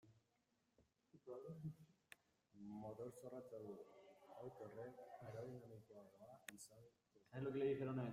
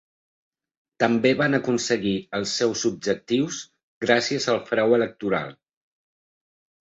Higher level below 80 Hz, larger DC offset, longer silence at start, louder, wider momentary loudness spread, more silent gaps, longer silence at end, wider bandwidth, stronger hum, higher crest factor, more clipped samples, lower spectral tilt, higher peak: second, -84 dBFS vs -62 dBFS; neither; second, 0.05 s vs 1 s; second, -53 LUFS vs -23 LUFS; first, 21 LU vs 8 LU; second, none vs 3.83-4.01 s; second, 0 s vs 1.3 s; first, 15.5 kHz vs 8 kHz; neither; about the same, 22 dB vs 22 dB; neither; first, -7 dB/octave vs -4 dB/octave; second, -32 dBFS vs -2 dBFS